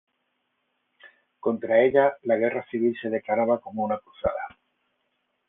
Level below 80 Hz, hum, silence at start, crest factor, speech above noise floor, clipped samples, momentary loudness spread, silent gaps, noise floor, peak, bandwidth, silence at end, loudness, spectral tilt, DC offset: -58 dBFS; none; 1.05 s; 20 dB; 52 dB; under 0.1%; 10 LU; none; -75 dBFS; -6 dBFS; 3.9 kHz; 1 s; -25 LUFS; -9.5 dB/octave; under 0.1%